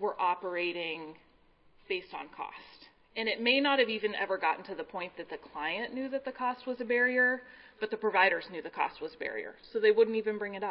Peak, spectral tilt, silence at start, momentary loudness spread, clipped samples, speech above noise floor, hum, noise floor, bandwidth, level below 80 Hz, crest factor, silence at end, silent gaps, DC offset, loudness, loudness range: -12 dBFS; -7 dB/octave; 0 s; 16 LU; under 0.1%; 32 dB; none; -64 dBFS; 5.6 kHz; -72 dBFS; 20 dB; 0 s; none; under 0.1%; -31 LUFS; 4 LU